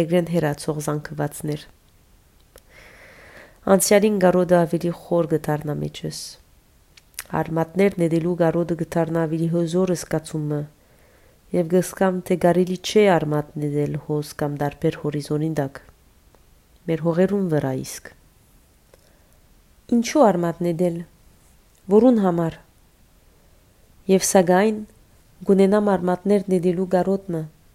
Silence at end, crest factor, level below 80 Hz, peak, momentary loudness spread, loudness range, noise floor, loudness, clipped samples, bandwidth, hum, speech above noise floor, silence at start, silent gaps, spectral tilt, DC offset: 0.25 s; 20 dB; -54 dBFS; -2 dBFS; 14 LU; 6 LU; -55 dBFS; -21 LUFS; under 0.1%; 16 kHz; none; 35 dB; 0 s; none; -6 dB/octave; under 0.1%